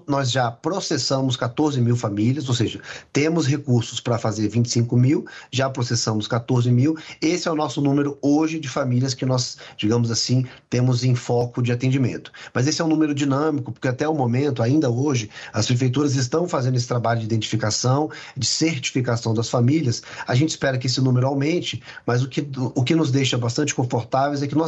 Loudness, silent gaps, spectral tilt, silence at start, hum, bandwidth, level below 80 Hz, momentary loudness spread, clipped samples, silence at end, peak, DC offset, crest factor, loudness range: -21 LUFS; none; -5.5 dB/octave; 0.1 s; none; 8.2 kHz; -58 dBFS; 5 LU; under 0.1%; 0 s; -6 dBFS; under 0.1%; 14 dB; 1 LU